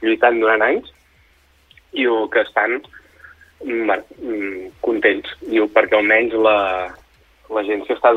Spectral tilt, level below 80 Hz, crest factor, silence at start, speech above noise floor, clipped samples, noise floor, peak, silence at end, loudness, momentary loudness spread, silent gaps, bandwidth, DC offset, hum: -5.5 dB/octave; -54 dBFS; 18 dB; 0 s; 38 dB; under 0.1%; -55 dBFS; -2 dBFS; 0 s; -18 LUFS; 11 LU; none; 6 kHz; under 0.1%; none